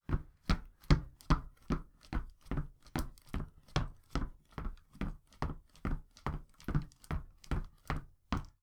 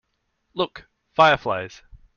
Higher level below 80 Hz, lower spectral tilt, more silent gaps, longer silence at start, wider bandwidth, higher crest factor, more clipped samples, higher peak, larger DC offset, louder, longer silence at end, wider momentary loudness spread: first, -40 dBFS vs -54 dBFS; first, -6.5 dB/octave vs -5 dB/octave; neither; second, 0.1 s vs 0.55 s; first, 15 kHz vs 7.2 kHz; first, 26 dB vs 20 dB; neither; second, -12 dBFS vs -4 dBFS; neither; second, -41 LUFS vs -21 LUFS; second, 0.15 s vs 0.5 s; second, 9 LU vs 18 LU